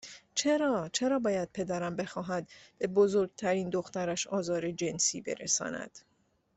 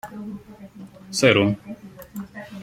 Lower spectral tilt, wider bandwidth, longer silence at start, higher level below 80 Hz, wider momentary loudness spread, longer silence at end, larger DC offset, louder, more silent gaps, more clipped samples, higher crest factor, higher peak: about the same, -3.5 dB/octave vs -4.5 dB/octave; second, 8.4 kHz vs 16.5 kHz; about the same, 0.05 s vs 0.05 s; second, -68 dBFS vs -58 dBFS; second, 9 LU vs 25 LU; first, 0.6 s vs 0 s; neither; second, -31 LUFS vs -20 LUFS; neither; neither; about the same, 18 dB vs 22 dB; second, -14 dBFS vs -2 dBFS